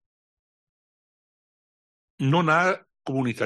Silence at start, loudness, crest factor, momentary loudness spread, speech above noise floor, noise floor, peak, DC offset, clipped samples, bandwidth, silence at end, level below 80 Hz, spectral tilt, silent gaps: 2.2 s; -24 LUFS; 18 dB; 11 LU; over 68 dB; under -90 dBFS; -8 dBFS; under 0.1%; under 0.1%; 11.5 kHz; 0 s; -70 dBFS; -6.5 dB/octave; none